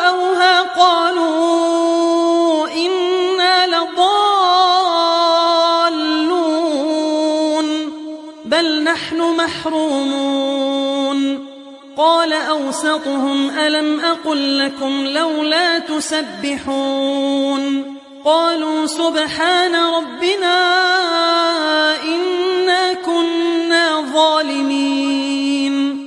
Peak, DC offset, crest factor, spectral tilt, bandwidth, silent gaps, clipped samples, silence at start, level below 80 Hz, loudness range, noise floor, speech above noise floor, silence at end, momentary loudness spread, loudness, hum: 0 dBFS; under 0.1%; 16 dB; -2 dB/octave; 11.5 kHz; none; under 0.1%; 0 s; -64 dBFS; 4 LU; -36 dBFS; 20 dB; 0 s; 6 LU; -15 LUFS; none